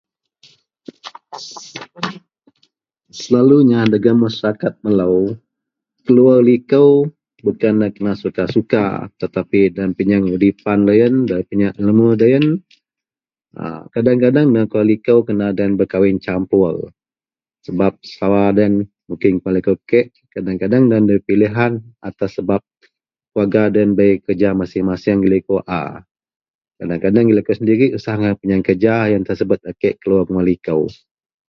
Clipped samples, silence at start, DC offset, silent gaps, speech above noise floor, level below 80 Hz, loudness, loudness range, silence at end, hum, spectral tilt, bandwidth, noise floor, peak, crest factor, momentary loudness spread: under 0.1%; 1.05 s; under 0.1%; 26.11-26.15 s, 26.36-26.40 s, 26.50-26.59 s; over 76 dB; -48 dBFS; -15 LUFS; 3 LU; 0.55 s; none; -8.5 dB/octave; 7.2 kHz; under -90 dBFS; 0 dBFS; 16 dB; 14 LU